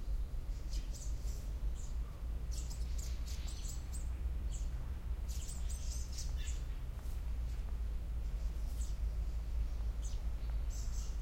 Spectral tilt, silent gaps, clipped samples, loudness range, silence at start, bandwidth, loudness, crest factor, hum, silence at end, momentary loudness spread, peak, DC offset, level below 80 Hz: -4.5 dB/octave; none; under 0.1%; 1 LU; 0 s; 16.5 kHz; -43 LUFS; 12 dB; none; 0 s; 3 LU; -28 dBFS; under 0.1%; -40 dBFS